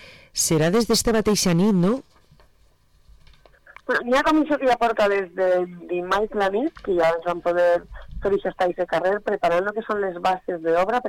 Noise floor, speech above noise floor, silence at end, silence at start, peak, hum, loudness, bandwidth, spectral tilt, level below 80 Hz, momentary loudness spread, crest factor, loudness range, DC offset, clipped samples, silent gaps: -58 dBFS; 37 dB; 0 s; 0 s; -12 dBFS; none; -22 LUFS; 19 kHz; -4.5 dB/octave; -46 dBFS; 7 LU; 10 dB; 2 LU; under 0.1%; under 0.1%; none